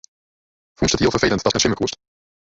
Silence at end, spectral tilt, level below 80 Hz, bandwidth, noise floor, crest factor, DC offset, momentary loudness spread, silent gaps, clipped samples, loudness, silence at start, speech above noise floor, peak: 0.65 s; -3.5 dB/octave; -40 dBFS; 8 kHz; under -90 dBFS; 20 dB; under 0.1%; 8 LU; none; under 0.1%; -19 LUFS; 0.8 s; over 71 dB; -2 dBFS